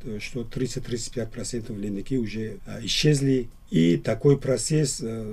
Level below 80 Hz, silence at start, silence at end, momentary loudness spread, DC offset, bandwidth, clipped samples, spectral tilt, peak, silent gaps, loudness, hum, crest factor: -42 dBFS; 0 s; 0 s; 12 LU; under 0.1%; 14 kHz; under 0.1%; -5.5 dB/octave; -6 dBFS; none; -26 LUFS; none; 18 dB